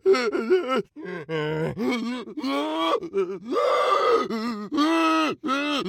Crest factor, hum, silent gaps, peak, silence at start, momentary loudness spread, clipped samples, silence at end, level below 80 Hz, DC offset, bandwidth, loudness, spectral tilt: 16 dB; none; none; -8 dBFS; 0.05 s; 8 LU; under 0.1%; 0 s; -66 dBFS; under 0.1%; 15.5 kHz; -24 LUFS; -5 dB/octave